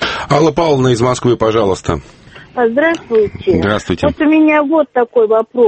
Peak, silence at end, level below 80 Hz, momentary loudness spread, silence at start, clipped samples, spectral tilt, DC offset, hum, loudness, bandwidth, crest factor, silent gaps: 0 dBFS; 0 s; -38 dBFS; 6 LU; 0 s; under 0.1%; -6 dB/octave; under 0.1%; none; -13 LUFS; 8.8 kHz; 12 dB; none